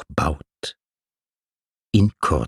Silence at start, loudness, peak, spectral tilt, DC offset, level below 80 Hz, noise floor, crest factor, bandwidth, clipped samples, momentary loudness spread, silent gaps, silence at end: 0 s; -22 LUFS; -4 dBFS; -6.5 dB/octave; under 0.1%; -36 dBFS; under -90 dBFS; 20 dB; 13 kHz; under 0.1%; 15 LU; 1.82-1.86 s; 0 s